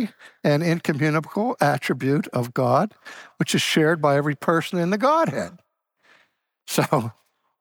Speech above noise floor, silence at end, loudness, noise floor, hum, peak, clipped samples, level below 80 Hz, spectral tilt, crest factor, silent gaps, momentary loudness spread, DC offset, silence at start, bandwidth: 43 dB; 0.5 s; -22 LUFS; -65 dBFS; none; -6 dBFS; under 0.1%; -70 dBFS; -5.5 dB/octave; 16 dB; none; 10 LU; under 0.1%; 0 s; over 20 kHz